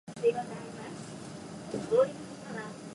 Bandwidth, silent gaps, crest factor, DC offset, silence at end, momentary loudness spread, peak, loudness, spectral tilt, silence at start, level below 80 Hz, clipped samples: 11.5 kHz; none; 18 dB; under 0.1%; 0 s; 16 LU; -14 dBFS; -34 LUFS; -5.5 dB/octave; 0.05 s; -68 dBFS; under 0.1%